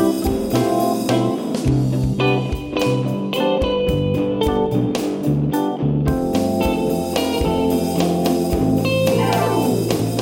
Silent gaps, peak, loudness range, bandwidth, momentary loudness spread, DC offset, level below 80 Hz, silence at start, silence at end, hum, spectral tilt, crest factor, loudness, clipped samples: none; -4 dBFS; 1 LU; 17 kHz; 3 LU; under 0.1%; -34 dBFS; 0 s; 0 s; none; -6.5 dB/octave; 14 dB; -19 LUFS; under 0.1%